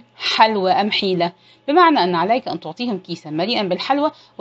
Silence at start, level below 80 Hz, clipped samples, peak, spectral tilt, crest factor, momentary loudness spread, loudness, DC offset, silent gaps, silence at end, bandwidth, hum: 0.2 s; -68 dBFS; under 0.1%; 0 dBFS; -5.5 dB/octave; 18 dB; 11 LU; -18 LUFS; under 0.1%; none; 0.3 s; 8 kHz; none